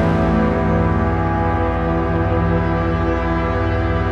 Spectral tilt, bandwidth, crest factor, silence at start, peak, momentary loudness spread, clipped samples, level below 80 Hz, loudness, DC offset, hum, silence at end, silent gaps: -9 dB/octave; 6.8 kHz; 12 dB; 0 s; -4 dBFS; 3 LU; under 0.1%; -26 dBFS; -18 LUFS; under 0.1%; none; 0 s; none